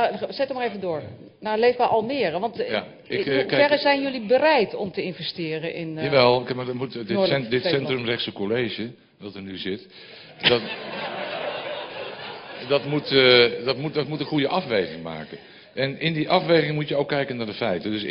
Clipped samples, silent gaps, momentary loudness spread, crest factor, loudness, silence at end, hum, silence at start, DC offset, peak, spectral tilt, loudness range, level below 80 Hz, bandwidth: under 0.1%; none; 16 LU; 20 dB; -23 LUFS; 0 s; none; 0 s; under 0.1%; -4 dBFS; -8.5 dB/octave; 5 LU; -62 dBFS; 5.6 kHz